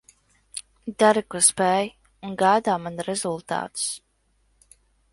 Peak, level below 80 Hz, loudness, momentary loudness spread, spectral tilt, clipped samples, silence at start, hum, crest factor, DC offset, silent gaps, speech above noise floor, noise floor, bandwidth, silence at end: -2 dBFS; -62 dBFS; -22 LUFS; 19 LU; -3 dB/octave; under 0.1%; 0.55 s; none; 22 dB; under 0.1%; none; 44 dB; -67 dBFS; 12 kHz; 1.15 s